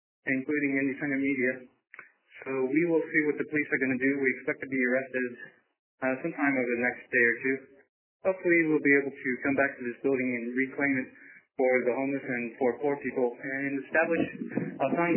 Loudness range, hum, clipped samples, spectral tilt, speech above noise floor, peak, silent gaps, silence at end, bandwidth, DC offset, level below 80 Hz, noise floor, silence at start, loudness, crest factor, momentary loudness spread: 3 LU; none; under 0.1%; -6.5 dB/octave; 23 dB; -12 dBFS; 5.79-5.98 s, 7.89-8.20 s; 0 s; 3.2 kHz; under 0.1%; -74 dBFS; -51 dBFS; 0.25 s; -28 LUFS; 18 dB; 9 LU